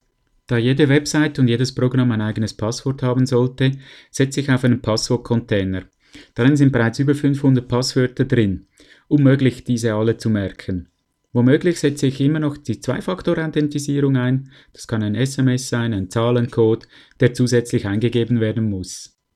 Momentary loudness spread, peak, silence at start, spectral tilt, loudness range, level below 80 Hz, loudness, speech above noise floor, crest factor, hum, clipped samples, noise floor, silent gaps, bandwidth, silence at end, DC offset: 9 LU; -2 dBFS; 0.5 s; -6.5 dB/octave; 2 LU; -48 dBFS; -19 LUFS; 33 dB; 16 dB; none; under 0.1%; -51 dBFS; none; 13 kHz; 0.3 s; under 0.1%